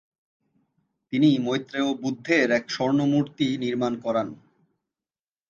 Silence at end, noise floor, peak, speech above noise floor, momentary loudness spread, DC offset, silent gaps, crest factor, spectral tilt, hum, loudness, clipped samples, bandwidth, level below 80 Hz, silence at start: 1.15 s; under -90 dBFS; -6 dBFS; over 67 dB; 7 LU; under 0.1%; none; 20 dB; -6 dB/octave; none; -24 LUFS; under 0.1%; 7.4 kHz; -68 dBFS; 1.1 s